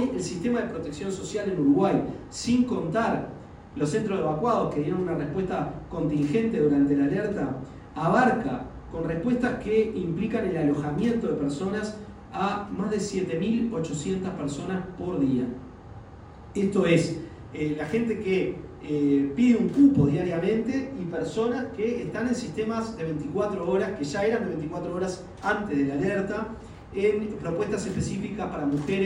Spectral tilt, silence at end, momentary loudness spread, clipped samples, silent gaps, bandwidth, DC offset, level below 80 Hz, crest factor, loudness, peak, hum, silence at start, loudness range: -6.5 dB/octave; 0 s; 11 LU; under 0.1%; none; 11 kHz; under 0.1%; -50 dBFS; 20 dB; -27 LUFS; -6 dBFS; none; 0 s; 5 LU